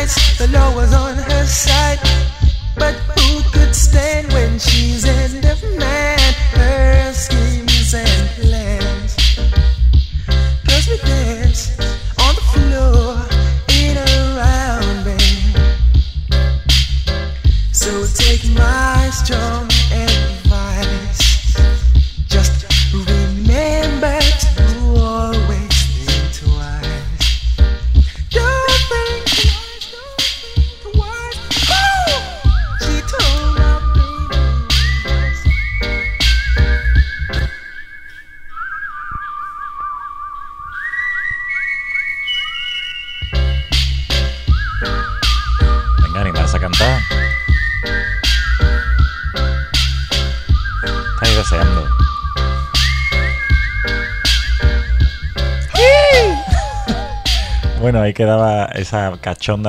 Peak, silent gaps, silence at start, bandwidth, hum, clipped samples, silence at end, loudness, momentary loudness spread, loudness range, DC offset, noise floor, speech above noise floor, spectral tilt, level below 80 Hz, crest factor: 0 dBFS; none; 0 s; 15 kHz; none; under 0.1%; 0 s; -15 LUFS; 7 LU; 4 LU; under 0.1%; -34 dBFS; 21 dB; -4 dB/octave; -16 dBFS; 14 dB